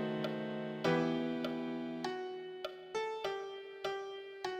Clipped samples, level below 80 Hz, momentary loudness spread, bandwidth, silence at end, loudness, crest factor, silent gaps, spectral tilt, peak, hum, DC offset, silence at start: under 0.1%; -76 dBFS; 11 LU; 15 kHz; 0 s; -39 LUFS; 18 dB; none; -6 dB/octave; -20 dBFS; none; under 0.1%; 0 s